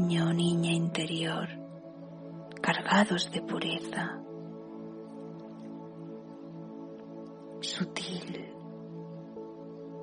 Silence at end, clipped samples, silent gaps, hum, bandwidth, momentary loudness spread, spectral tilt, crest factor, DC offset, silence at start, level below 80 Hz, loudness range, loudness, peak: 0 s; under 0.1%; none; none; 10 kHz; 18 LU; -5 dB/octave; 22 dB; under 0.1%; 0 s; -74 dBFS; 12 LU; -31 LUFS; -12 dBFS